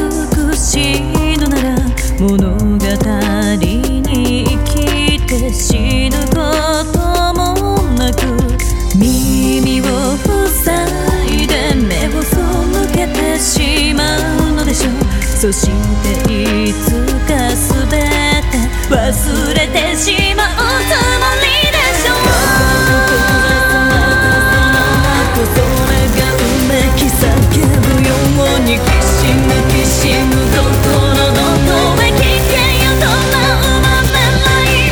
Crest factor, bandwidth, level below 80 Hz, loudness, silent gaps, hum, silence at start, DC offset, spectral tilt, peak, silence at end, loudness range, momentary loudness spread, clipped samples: 10 dB; over 20 kHz; -18 dBFS; -12 LUFS; none; none; 0 s; under 0.1%; -4.5 dB/octave; 0 dBFS; 0 s; 4 LU; 4 LU; under 0.1%